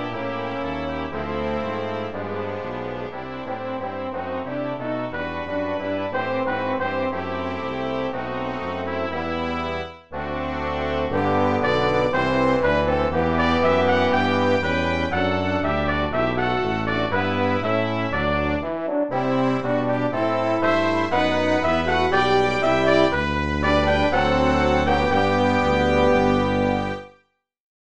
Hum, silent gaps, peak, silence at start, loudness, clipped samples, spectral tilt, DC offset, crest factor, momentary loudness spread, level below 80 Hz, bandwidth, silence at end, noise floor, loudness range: none; none; -4 dBFS; 0 s; -22 LUFS; under 0.1%; -6.5 dB/octave; 1%; 18 dB; 10 LU; -38 dBFS; 9.2 kHz; 0.3 s; -63 dBFS; 8 LU